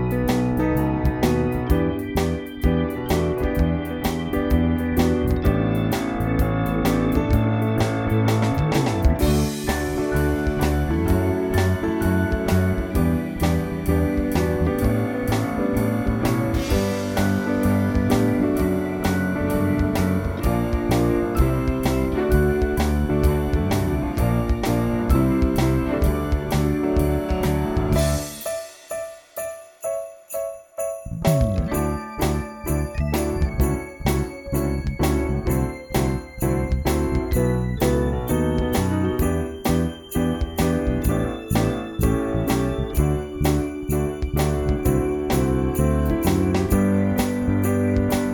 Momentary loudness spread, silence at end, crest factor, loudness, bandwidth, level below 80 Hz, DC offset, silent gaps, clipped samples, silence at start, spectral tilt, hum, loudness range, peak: 5 LU; 0 s; 16 dB; -22 LUFS; 19.5 kHz; -28 dBFS; under 0.1%; none; under 0.1%; 0 s; -6.5 dB/octave; none; 3 LU; -6 dBFS